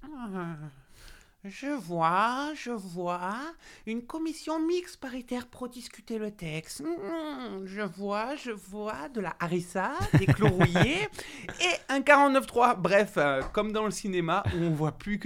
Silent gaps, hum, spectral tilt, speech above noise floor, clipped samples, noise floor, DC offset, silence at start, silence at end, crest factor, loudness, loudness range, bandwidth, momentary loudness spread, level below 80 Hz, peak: none; none; -5.5 dB/octave; 24 dB; under 0.1%; -52 dBFS; under 0.1%; 0 s; 0 s; 22 dB; -29 LUFS; 11 LU; 16.5 kHz; 16 LU; -50 dBFS; -6 dBFS